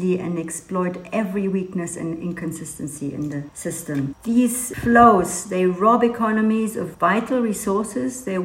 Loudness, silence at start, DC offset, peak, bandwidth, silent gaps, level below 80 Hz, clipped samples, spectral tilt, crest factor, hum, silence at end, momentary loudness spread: -21 LUFS; 0 s; under 0.1%; 0 dBFS; 16 kHz; none; -50 dBFS; under 0.1%; -5.5 dB/octave; 20 dB; none; 0 s; 12 LU